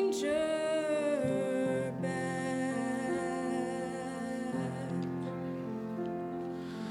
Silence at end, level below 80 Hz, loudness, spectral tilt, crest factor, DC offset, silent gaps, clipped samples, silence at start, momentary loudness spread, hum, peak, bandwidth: 0 s; -68 dBFS; -35 LUFS; -6 dB/octave; 14 dB; under 0.1%; none; under 0.1%; 0 s; 7 LU; none; -20 dBFS; 16 kHz